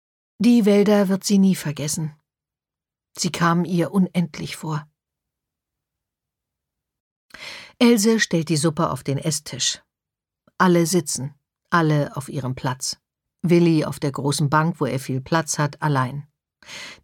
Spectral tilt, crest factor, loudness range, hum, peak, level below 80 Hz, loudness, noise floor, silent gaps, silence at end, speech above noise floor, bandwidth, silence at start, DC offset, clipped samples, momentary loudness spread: -5 dB/octave; 18 dB; 5 LU; none; -4 dBFS; -60 dBFS; -21 LUFS; -89 dBFS; 7.00-7.29 s; 0.1 s; 69 dB; 17.5 kHz; 0.4 s; under 0.1%; under 0.1%; 15 LU